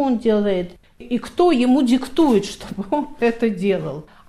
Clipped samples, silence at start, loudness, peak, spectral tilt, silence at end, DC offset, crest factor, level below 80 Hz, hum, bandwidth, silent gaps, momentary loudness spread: under 0.1%; 0 s; -19 LUFS; -4 dBFS; -6 dB/octave; 0.25 s; under 0.1%; 14 dB; -46 dBFS; none; 13 kHz; none; 11 LU